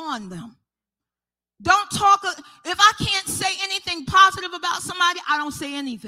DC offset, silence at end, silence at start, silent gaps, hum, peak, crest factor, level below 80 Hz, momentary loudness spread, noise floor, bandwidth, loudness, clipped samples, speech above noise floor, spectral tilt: under 0.1%; 0 s; 0 s; none; none; -2 dBFS; 20 dB; -52 dBFS; 14 LU; under -90 dBFS; 16.5 kHz; -20 LUFS; under 0.1%; over 69 dB; -1.5 dB/octave